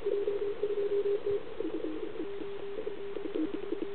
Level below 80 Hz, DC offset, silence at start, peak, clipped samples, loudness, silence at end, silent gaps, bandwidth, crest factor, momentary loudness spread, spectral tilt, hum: -64 dBFS; 1%; 0 s; -18 dBFS; under 0.1%; -35 LUFS; 0 s; none; 4.4 kHz; 14 dB; 8 LU; -9 dB/octave; none